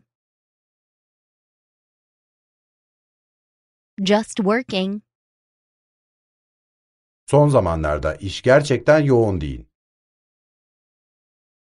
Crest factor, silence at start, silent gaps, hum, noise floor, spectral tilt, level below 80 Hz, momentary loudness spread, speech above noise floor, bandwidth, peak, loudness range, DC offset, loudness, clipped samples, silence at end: 22 dB; 4 s; 5.15-7.27 s; none; under -90 dBFS; -6.5 dB/octave; -42 dBFS; 12 LU; over 72 dB; 11.5 kHz; -2 dBFS; 7 LU; under 0.1%; -18 LUFS; under 0.1%; 2.05 s